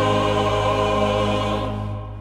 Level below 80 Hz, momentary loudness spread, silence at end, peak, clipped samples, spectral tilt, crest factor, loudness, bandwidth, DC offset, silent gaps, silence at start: -34 dBFS; 8 LU; 0 s; -8 dBFS; under 0.1%; -6 dB/octave; 14 dB; -21 LUFS; 13 kHz; under 0.1%; none; 0 s